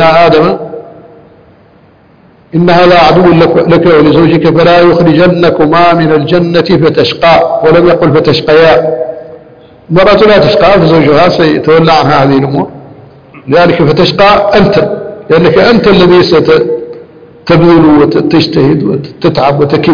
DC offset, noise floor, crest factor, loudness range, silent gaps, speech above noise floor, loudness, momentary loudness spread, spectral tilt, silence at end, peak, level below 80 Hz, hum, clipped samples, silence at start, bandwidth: 2%; -40 dBFS; 6 dB; 3 LU; none; 36 dB; -5 LUFS; 8 LU; -7.5 dB/octave; 0 s; 0 dBFS; -32 dBFS; none; 3%; 0 s; 5.4 kHz